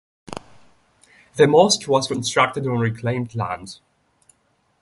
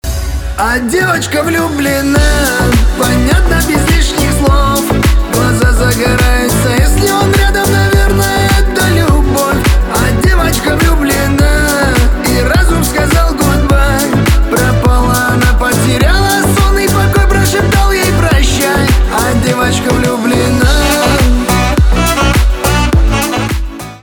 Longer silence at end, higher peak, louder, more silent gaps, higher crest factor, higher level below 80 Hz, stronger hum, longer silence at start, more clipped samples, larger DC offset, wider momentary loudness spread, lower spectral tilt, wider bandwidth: first, 1.05 s vs 0.05 s; about the same, 0 dBFS vs 0 dBFS; second, -19 LUFS vs -10 LUFS; neither; first, 22 dB vs 8 dB; second, -56 dBFS vs -14 dBFS; neither; first, 0.3 s vs 0.05 s; neither; neither; first, 22 LU vs 2 LU; about the same, -4.5 dB/octave vs -5 dB/octave; second, 11.5 kHz vs over 20 kHz